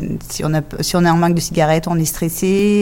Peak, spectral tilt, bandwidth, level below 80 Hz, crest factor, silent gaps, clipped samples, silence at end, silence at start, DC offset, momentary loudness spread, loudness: -2 dBFS; -5.5 dB/octave; 17 kHz; -36 dBFS; 14 dB; none; under 0.1%; 0 s; 0 s; under 0.1%; 6 LU; -16 LUFS